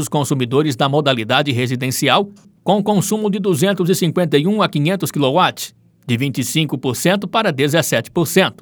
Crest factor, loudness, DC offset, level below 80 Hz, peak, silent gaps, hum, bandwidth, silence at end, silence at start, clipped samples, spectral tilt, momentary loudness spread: 16 dB; -17 LUFS; under 0.1%; -62 dBFS; 0 dBFS; none; none; over 20 kHz; 0.1 s; 0 s; under 0.1%; -5 dB/octave; 4 LU